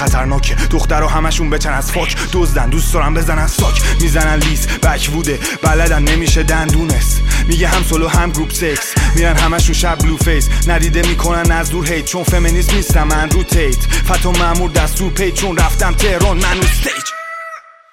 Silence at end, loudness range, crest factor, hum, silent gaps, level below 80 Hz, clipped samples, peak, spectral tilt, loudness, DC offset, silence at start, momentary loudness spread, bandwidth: 0.35 s; 1 LU; 12 dB; none; none; -14 dBFS; under 0.1%; 0 dBFS; -4 dB/octave; -14 LUFS; under 0.1%; 0 s; 3 LU; 16.5 kHz